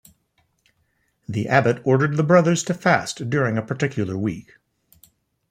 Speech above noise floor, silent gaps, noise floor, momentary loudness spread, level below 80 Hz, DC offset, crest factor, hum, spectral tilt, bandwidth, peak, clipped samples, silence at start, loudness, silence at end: 48 dB; none; -68 dBFS; 11 LU; -60 dBFS; under 0.1%; 20 dB; none; -6 dB/octave; 15.5 kHz; -2 dBFS; under 0.1%; 1.3 s; -20 LUFS; 1.1 s